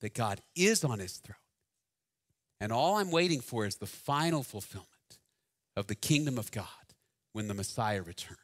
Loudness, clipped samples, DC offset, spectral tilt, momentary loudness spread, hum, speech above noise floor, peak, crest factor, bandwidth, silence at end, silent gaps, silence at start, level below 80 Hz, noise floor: -33 LUFS; under 0.1%; under 0.1%; -4.5 dB/octave; 15 LU; none; 56 dB; -12 dBFS; 24 dB; 16 kHz; 0.1 s; none; 0 s; -66 dBFS; -89 dBFS